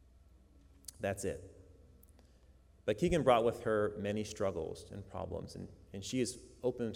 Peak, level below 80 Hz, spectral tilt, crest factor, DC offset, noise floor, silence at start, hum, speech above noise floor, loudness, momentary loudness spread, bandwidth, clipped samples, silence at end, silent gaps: -16 dBFS; -58 dBFS; -5.5 dB/octave; 22 dB; under 0.1%; -63 dBFS; 0.85 s; none; 27 dB; -36 LUFS; 18 LU; 17 kHz; under 0.1%; 0 s; none